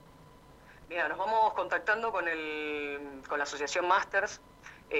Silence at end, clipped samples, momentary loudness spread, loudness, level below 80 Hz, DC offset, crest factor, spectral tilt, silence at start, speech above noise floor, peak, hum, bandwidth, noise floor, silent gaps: 0 s; under 0.1%; 11 LU; -31 LUFS; -64 dBFS; under 0.1%; 20 dB; -2.5 dB/octave; 0.05 s; 24 dB; -12 dBFS; none; 15.5 kHz; -55 dBFS; none